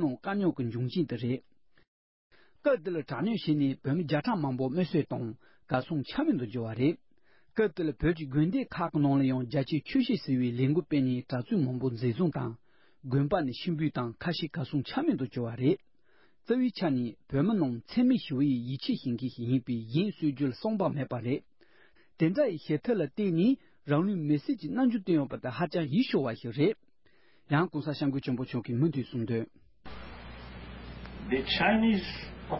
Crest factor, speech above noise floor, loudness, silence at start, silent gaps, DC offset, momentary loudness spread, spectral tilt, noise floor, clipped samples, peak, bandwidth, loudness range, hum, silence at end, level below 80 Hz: 18 dB; 39 dB; -30 LUFS; 0 s; 1.88-2.30 s; under 0.1%; 8 LU; -11 dB/octave; -69 dBFS; under 0.1%; -12 dBFS; 5.8 kHz; 3 LU; none; 0 s; -56 dBFS